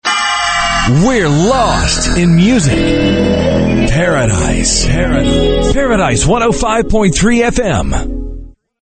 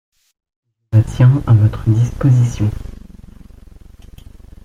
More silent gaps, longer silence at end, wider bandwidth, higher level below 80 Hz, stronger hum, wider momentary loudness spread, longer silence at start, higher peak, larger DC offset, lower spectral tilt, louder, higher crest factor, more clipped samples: neither; second, 0.3 s vs 1.7 s; first, 9.2 kHz vs 7.6 kHz; first, -20 dBFS vs -34 dBFS; neither; second, 3 LU vs 9 LU; second, 0.05 s vs 0.9 s; about the same, 0 dBFS vs -2 dBFS; neither; second, -4.5 dB/octave vs -8.5 dB/octave; first, -11 LUFS vs -14 LUFS; about the same, 10 dB vs 14 dB; neither